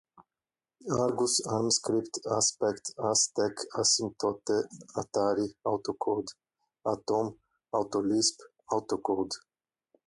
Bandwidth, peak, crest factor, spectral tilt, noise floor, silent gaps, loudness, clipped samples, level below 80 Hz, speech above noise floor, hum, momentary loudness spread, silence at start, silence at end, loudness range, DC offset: 11.5 kHz; -14 dBFS; 18 dB; -3 dB/octave; under -90 dBFS; none; -30 LUFS; under 0.1%; -68 dBFS; over 60 dB; none; 9 LU; 0.2 s; 0.7 s; 4 LU; under 0.1%